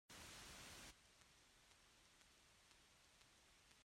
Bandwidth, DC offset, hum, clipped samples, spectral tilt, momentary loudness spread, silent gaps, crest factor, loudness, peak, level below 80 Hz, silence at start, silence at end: 16 kHz; under 0.1%; none; under 0.1%; -1.5 dB/octave; 12 LU; none; 18 dB; -60 LUFS; -48 dBFS; -78 dBFS; 0.1 s; 0 s